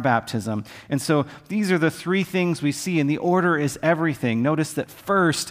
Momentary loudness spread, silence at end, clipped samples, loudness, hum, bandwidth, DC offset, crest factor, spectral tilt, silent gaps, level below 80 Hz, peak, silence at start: 8 LU; 0 s; under 0.1%; -23 LUFS; none; 16 kHz; under 0.1%; 16 dB; -5.5 dB/octave; none; -60 dBFS; -6 dBFS; 0 s